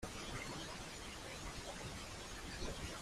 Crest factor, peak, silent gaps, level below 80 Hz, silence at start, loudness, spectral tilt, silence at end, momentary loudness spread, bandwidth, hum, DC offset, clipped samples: 18 dB; -30 dBFS; none; -54 dBFS; 0 s; -47 LUFS; -3 dB/octave; 0 s; 3 LU; 15.5 kHz; none; under 0.1%; under 0.1%